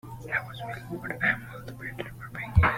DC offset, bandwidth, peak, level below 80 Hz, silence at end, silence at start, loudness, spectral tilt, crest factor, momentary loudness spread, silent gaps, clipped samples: under 0.1%; 16 kHz; -6 dBFS; -40 dBFS; 0 s; 0.05 s; -31 LUFS; -6.5 dB/octave; 22 dB; 12 LU; none; under 0.1%